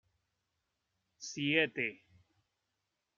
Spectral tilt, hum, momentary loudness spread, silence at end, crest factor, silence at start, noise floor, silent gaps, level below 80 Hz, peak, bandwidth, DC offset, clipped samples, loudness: -3.5 dB/octave; none; 15 LU; 1.2 s; 26 dB; 1.2 s; -86 dBFS; none; -84 dBFS; -14 dBFS; 7.4 kHz; under 0.1%; under 0.1%; -33 LUFS